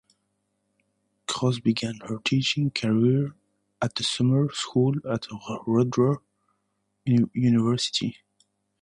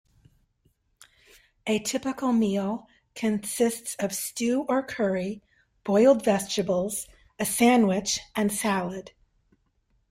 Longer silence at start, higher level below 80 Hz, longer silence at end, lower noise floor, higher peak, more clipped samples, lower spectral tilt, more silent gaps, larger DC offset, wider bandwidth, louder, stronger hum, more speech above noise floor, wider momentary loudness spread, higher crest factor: second, 1.3 s vs 1.65 s; about the same, -62 dBFS vs -62 dBFS; second, 0.7 s vs 1 s; first, -75 dBFS vs -70 dBFS; about the same, -8 dBFS vs -8 dBFS; neither; first, -6 dB/octave vs -4.5 dB/octave; neither; neither; second, 11 kHz vs 16 kHz; about the same, -25 LUFS vs -26 LUFS; neither; first, 52 dB vs 45 dB; second, 10 LU vs 15 LU; about the same, 16 dB vs 18 dB